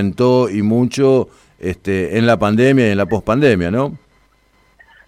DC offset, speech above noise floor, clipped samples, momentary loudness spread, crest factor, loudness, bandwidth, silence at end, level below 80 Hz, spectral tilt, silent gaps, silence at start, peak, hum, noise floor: under 0.1%; 41 dB; under 0.1%; 11 LU; 14 dB; -15 LUFS; 13.5 kHz; 1.1 s; -46 dBFS; -7 dB/octave; none; 0 s; -2 dBFS; none; -55 dBFS